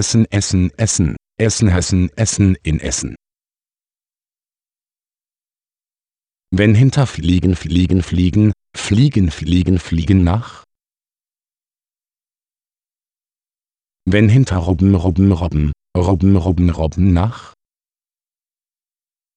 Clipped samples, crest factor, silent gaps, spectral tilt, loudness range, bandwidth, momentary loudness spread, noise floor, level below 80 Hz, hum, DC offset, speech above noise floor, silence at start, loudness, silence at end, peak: under 0.1%; 16 dB; none; -6 dB/octave; 8 LU; 10.5 kHz; 7 LU; under -90 dBFS; -32 dBFS; none; under 0.1%; over 76 dB; 0 s; -15 LUFS; 1.9 s; 0 dBFS